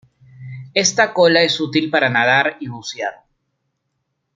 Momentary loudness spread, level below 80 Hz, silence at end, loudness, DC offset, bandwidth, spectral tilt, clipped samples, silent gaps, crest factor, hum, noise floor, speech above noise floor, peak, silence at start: 15 LU; -64 dBFS; 1.25 s; -16 LUFS; under 0.1%; 9.4 kHz; -3 dB/octave; under 0.1%; none; 18 dB; none; -73 dBFS; 56 dB; 0 dBFS; 0.4 s